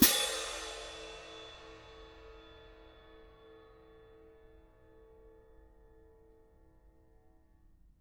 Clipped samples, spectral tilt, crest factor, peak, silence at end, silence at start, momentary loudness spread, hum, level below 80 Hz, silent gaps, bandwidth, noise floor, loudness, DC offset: under 0.1%; -1.5 dB/octave; 32 dB; -8 dBFS; 4.45 s; 0 s; 25 LU; none; -60 dBFS; none; over 20 kHz; -64 dBFS; -35 LUFS; under 0.1%